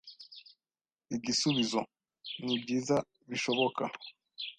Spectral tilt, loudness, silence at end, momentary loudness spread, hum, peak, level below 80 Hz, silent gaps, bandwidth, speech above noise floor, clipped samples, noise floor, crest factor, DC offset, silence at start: -3.5 dB/octave; -33 LUFS; 0.05 s; 20 LU; none; -16 dBFS; -72 dBFS; none; 9.6 kHz; over 58 dB; under 0.1%; under -90 dBFS; 20 dB; under 0.1%; 0.05 s